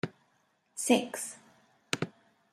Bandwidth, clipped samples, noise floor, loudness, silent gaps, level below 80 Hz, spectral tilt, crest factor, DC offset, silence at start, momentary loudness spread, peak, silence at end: 15.5 kHz; under 0.1%; -72 dBFS; -32 LUFS; none; -80 dBFS; -3.5 dB/octave; 28 dB; under 0.1%; 0.05 s; 16 LU; -8 dBFS; 0.45 s